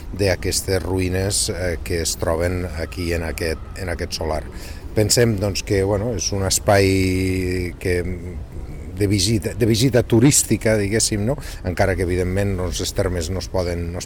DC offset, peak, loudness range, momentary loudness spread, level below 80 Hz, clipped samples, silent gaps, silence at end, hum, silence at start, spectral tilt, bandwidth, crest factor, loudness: 0.2%; -4 dBFS; 5 LU; 11 LU; -32 dBFS; under 0.1%; none; 0 s; none; 0 s; -4.5 dB/octave; 19.5 kHz; 16 dB; -20 LUFS